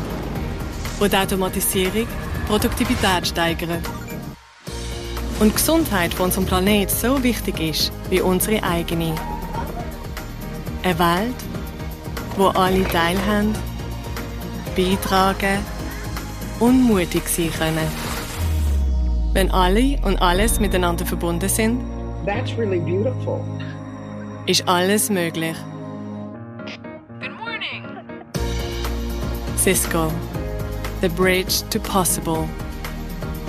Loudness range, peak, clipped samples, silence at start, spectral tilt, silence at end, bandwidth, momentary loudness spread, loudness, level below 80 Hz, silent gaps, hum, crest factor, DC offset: 4 LU; -4 dBFS; under 0.1%; 0 s; -4.5 dB/octave; 0 s; 15.5 kHz; 14 LU; -21 LUFS; -28 dBFS; none; none; 18 dB; under 0.1%